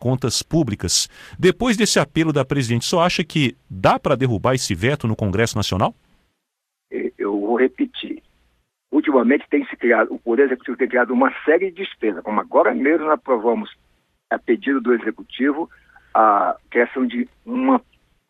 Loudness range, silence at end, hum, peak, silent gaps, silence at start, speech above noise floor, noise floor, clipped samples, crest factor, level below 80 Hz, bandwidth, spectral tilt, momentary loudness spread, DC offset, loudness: 4 LU; 0.5 s; none; -2 dBFS; none; 0 s; 60 dB; -79 dBFS; under 0.1%; 18 dB; -48 dBFS; 15.5 kHz; -5 dB/octave; 9 LU; under 0.1%; -19 LUFS